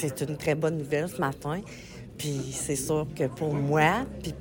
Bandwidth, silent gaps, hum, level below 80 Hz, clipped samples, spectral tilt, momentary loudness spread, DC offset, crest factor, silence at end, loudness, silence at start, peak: 17 kHz; none; none; -50 dBFS; under 0.1%; -5 dB/octave; 12 LU; under 0.1%; 20 dB; 0 s; -29 LUFS; 0 s; -8 dBFS